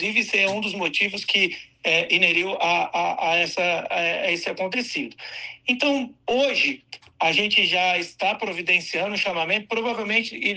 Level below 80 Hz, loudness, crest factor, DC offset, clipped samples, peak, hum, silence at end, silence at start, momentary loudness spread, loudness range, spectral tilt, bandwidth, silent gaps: -68 dBFS; -21 LUFS; 18 dB; under 0.1%; under 0.1%; -6 dBFS; none; 0 s; 0 s; 8 LU; 3 LU; -3 dB/octave; 9.6 kHz; none